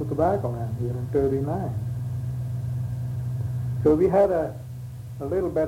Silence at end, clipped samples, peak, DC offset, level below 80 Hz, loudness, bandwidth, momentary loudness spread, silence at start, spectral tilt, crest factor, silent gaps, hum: 0 s; under 0.1%; -8 dBFS; under 0.1%; -44 dBFS; -26 LUFS; 15.5 kHz; 12 LU; 0 s; -9.5 dB/octave; 16 dB; none; none